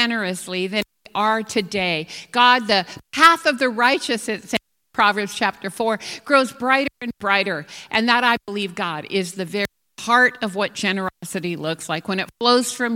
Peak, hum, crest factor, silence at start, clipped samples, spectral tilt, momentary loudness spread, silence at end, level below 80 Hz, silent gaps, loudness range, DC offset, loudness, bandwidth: 0 dBFS; none; 20 dB; 0 s; under 0.1%; -3 dB/octave; 11 LU; 0 s; -62 dBFS; none; 4 LU; under 0.1%; -20 LUFS; 17.5 kHz